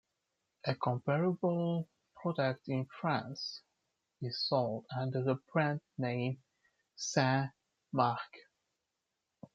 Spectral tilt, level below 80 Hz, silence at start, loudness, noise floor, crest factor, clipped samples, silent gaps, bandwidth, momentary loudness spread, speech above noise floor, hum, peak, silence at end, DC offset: -5.5 dB/octave; -80 dBFS; 0.65 s; -35 LUFS; -87 dBFS; 22 dB; under 0.1%; none; 7.8 kHz; 10 LU; 53 dB; none; -14 dBFS; 1.15 s; under 0.1%